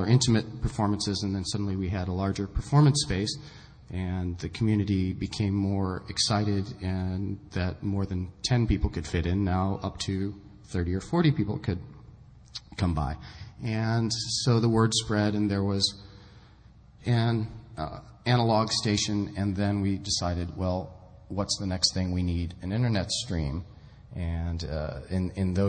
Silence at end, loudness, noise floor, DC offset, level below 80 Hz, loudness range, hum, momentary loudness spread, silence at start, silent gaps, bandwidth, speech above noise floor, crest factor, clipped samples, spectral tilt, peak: 0 s; -28 LUFS; -53 dBFS; under 0.1%; -44 dBFS; 4 LU; none; 12 LU; 0 s; none; 9.4 kHz; 26 dB; 20 dB; under 0.1%; -5.5 dB/octave; -8 dBFS